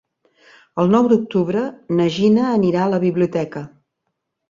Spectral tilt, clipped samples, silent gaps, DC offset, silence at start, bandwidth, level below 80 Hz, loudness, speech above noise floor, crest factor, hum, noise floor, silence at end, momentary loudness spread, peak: -8 dB/octave; under 0.1%; none; under 0.1%; 0.75 s; 7.4 kHz; -58 dBFS; -18 LUFS; 59 dB; 16 dB; none; -76 dBFS; 0.85 s; 12 LU; -2 dBFS